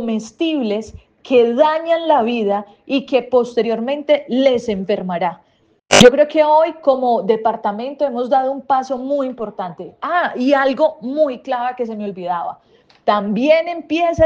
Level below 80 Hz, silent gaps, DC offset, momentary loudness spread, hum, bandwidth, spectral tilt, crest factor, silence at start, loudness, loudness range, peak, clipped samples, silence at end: -50 dBFS; none; under 0.1%; 10 LU; none; 10 kHz; -4 dB/octave; 16 dB; 0 s; -17 LUFS; 5 LU; 0 dBFS; under 0.1%; 0 s